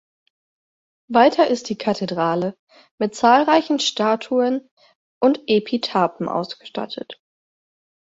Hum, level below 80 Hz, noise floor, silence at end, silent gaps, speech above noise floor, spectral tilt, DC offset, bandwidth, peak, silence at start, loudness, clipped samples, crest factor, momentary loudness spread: none; -66 dBFS; under -90 dBFS; 0.9 s; 2.59-2.67 s, 2.91-2.98 s, 4.71-4.77 s, 4.95-5.21 s; over 71 dB; -4.5 dB/octave; under 0.1%; 8 kHz; -2 dBFS; 1.1 s; -20 LUFS; under 0.1%; 18 dB; 14 LU